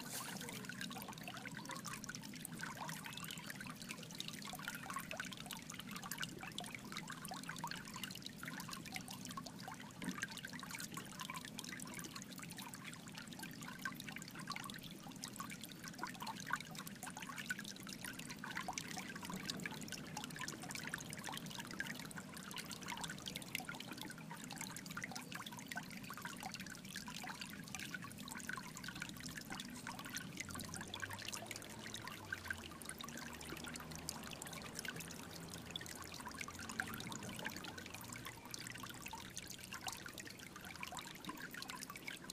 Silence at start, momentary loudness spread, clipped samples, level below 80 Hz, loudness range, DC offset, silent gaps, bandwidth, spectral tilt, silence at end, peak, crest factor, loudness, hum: 0 s; 4 LU; under 0.1%; -72 dBFS; 2 LU; under 0.1%; none; 15.5 kHz; -2.5 dB/octave; 0 s; -20 dBFS; 28 dB; -48 LUFS; none